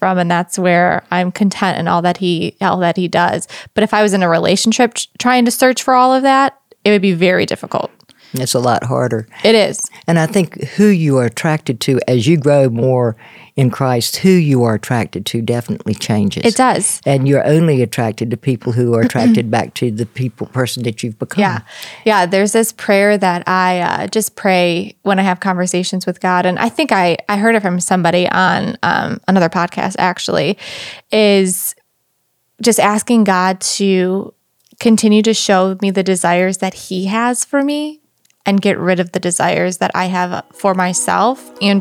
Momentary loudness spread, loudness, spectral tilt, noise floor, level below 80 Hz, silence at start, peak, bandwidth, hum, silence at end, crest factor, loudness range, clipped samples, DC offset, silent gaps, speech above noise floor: 8 LU; -14 LUFS; -5 dB/octave; -64 dBFS; -60 dBFS; 0 s; 0 dBFS; 16 kHz; none; 0 s; 14 dB; 3 LU; under 0.1%; under 0.1%; none; 50 dB